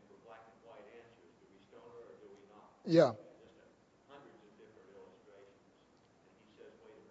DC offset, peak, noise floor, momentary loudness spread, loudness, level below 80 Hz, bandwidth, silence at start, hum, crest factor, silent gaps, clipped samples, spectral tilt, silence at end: under 0.1%; -14 dBFS; -68 dBFS; 31 LU; -31 LUFS; -84 dBFS; 7.6 kHz; 2.85 s; none; 28 dB; none; under 0.1%; -6 dB/octave; 3.95 s